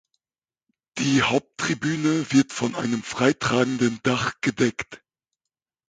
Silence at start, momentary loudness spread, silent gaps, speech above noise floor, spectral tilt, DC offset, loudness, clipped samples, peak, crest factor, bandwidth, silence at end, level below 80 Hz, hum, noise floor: 0.95 s; 7 LU; none; over 67 dB; -4.5 dB/octave; under 0.1%; -23 LUFS; under 0.1%; -4 dBFS; 20 dB; 9.4 kHz; 0.95 s; -58 dBFS; none; under -90 dBFS